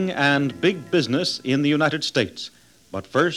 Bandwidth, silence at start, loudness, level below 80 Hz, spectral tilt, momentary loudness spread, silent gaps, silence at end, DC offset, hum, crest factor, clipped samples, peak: 13 kHz; 0 s; -21 LUFS; -62 dBFS; -5 dB/octave; 15 LU; none; 0 s; under 0.1%; none; 16 dB; under 0.1%; -6 dBFS